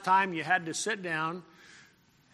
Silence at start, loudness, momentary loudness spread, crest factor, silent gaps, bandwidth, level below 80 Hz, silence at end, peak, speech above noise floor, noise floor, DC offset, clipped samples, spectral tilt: 0 s; -30 LUFS; 9 LU; 20 dB; none; 13 kHz; -80 dBFS; 0.55 s; -12 dBFS; 33 dB; -63 dBFS; under 0.1%; under 0.1%; -3 dB/octave